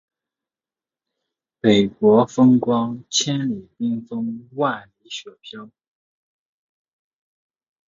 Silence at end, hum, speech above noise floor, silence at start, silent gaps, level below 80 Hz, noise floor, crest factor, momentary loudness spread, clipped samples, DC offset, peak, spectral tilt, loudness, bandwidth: 2.25 s; none; over 70 dB; 1.65 s; none; -62 dBFS; under -90 dBFS; 20 dB; 18 LU; under 0.1%; under 0.1%; -2 dBFS; -5 dB/octave; -19 LUFS; 7.6 kHz